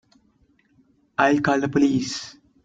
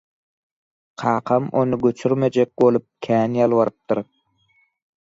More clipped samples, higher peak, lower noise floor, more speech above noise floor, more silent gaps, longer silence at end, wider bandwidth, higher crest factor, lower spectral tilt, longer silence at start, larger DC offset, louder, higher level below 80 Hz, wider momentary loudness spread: neither; about the same, -4 dBFS vs -4 dBFS; about the same, -62 dBFS vs -63 dBFS; about the same, 42 dB vs 44 dB; neither; second, 0.35 s vs 1 s; about the same, 7.8 kHz vs 7.8 kHz; about the same, 20 dB vs 16 dB; second, -5 dB/octave vs -8 dB/octave; first, 1.2 s vs 1 s; neither; about the same, -22 LUFS vs -20 LUFS; about the same, -60 dBFS vs -62 dBFS; first, 13 LU vs 8 LU